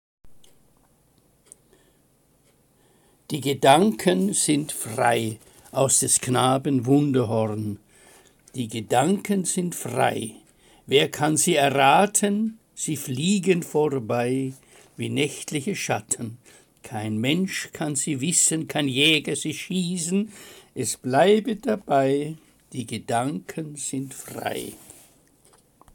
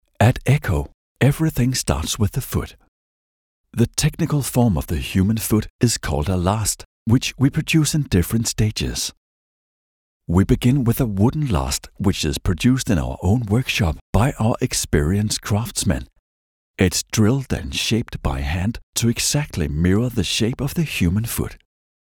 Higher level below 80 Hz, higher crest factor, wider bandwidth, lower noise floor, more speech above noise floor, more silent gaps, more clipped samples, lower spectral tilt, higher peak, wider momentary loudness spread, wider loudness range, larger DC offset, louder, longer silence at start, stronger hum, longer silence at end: second, -64 dBFS vs -34 dBFS; about the same, 22 dB vs 18 dB; second, 17 kHz vs 19.5 kHz; second, -62 dBFS vs under -90 dBFS; second, 39 dB vs over 71 dB; second, none vs 0.94-1.15 s, 2.88-3.64 s, 5.70-5.79 s, 6.85-7.06 s, 9.17-10.20 s, 14.01-14.13 s, 16.19-16.74 s, 18.83-18.93 s; neither; about the same, -4 dB/octave vs -5 dB/octave; about the same, -2 dBFS vs -2 dBFS; first, 15 LU vs 6 LU; first, 6 LU vs 2 LU; neither; second, -23 LUFS vs -20 LUFS; about the same, 0.25 s vs 0.2 s; neither; first, 1.15 s vs 0.6 s